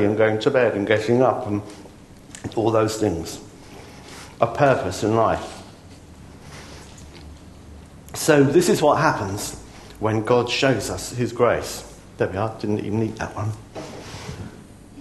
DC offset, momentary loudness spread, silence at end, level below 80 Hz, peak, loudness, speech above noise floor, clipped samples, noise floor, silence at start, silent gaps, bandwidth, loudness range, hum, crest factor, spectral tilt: under 0.1%; 24 LU; 0 s; -48 dBFS; -2 dBFS; -21 LUFS; 23 dB; under 0.1%; -43 dBFS; 0 s; none; 13 kHz; 7 LU; none; 22 dB; -5.5 dB/octave